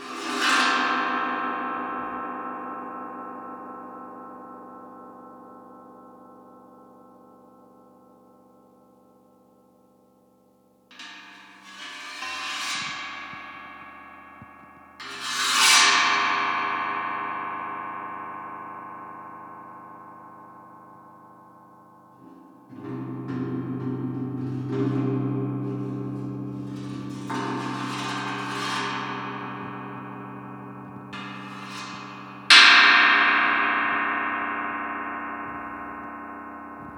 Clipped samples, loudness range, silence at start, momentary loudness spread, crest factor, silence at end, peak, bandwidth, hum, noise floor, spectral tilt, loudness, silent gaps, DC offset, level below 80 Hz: under 0.1%; 24 LU; 0 s; 24 LU; 28 dB; 0 s; 0 dBFS; over 20 kHz; none; -60 dBFS; -2.5 dB/octave; -23 LUFS; none; under 0.1%; -68 dBFS